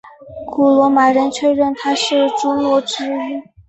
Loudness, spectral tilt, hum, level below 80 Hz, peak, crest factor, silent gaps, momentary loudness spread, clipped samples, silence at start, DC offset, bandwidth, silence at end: -15 LUFS; -3.5 dB/octave; none; -54 dBFS; -2 dBFS; 14 dB; none; 13 LU; under 0.1%; 0.05 s; under 0.1%; 8.4 kHz; 0.25 s